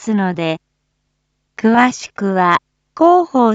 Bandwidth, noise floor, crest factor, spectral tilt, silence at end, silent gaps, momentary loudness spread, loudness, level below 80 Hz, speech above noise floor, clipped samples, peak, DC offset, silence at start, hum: 8 kHz; -69 dBFS; 16 dB; -6 dB/octave; 0 s; none; 10 LU; -15 LUFS; -62 dBFS; 55 dB; under 0.1%; 0 dBFS; under 0.1%; 0 s; none